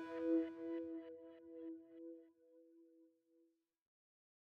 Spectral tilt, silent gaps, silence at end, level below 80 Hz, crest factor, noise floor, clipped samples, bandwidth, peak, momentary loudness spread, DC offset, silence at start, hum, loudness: -7 dB/octave; none; 1.4 s; under -90 dBFS; 20 dB; -79 dBFS; under 0.1%; 4.7 kHz; -30 dBFS; 18 LU; under 0.1%; 0 s; none; -46 LUFS